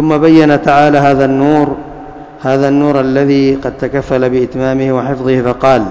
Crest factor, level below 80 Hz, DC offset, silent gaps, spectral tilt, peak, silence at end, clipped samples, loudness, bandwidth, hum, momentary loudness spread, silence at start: 10 dB; -38 dBFS; under 0.1%; none; -7.5 dB/octave; 0 dBFS; 0 s; 2%; -11 LUFS; 8 kHz; none; 10 LU; 0 s